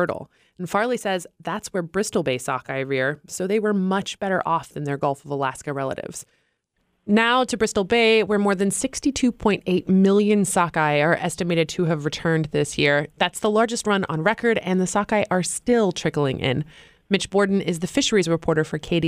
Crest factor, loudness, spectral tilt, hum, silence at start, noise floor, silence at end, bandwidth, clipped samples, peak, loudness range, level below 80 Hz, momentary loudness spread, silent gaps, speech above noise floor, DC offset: 18 dB; -22 LUFS; -4.5 dB/octave; none; 0 s; -71 dBFS; 0 s; 15.5 kHz; under 0.1%; -4 dBFS; 5 LU; -52 dBFS; 9 LU; none; 49 dB; under 0.1%